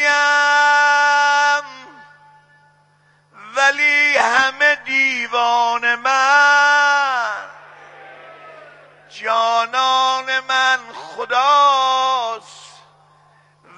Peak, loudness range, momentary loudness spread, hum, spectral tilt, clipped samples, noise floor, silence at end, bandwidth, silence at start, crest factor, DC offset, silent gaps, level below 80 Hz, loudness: 0 dBFS; 5 LU; 11 LU; none; 0.5 dB/octave; under 0.1%; -56 dBFS; 1.1 s; 11 kHz; 0 s; 18 dB; under 0.1%; none; -70 dBFS; -15 LUFS